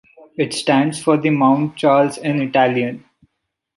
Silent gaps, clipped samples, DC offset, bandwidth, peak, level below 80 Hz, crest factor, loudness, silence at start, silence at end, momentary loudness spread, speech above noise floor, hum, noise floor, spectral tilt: none; under 0.1%; under 0.1%; 11.5 kHz; -2 dBFS; -62 dBFS; 16 dB; -17 LUFS; 0.4 s; 0.8 s; 9 LU; 56 dB; none; -72 dBFS; -6 dB/octave